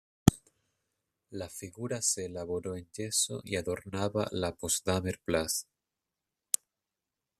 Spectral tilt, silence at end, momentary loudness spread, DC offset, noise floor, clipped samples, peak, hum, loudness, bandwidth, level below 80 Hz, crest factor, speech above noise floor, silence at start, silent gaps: -4 dB/octave; 1.75 s; 12 LU; under 0.1%; -89 dBFS; under 0.1%; -2 dBFS; none; -32 LUFS; 14.5 kHz; -56 dBFS; 32 dB; 55 dB; 0.25 s; none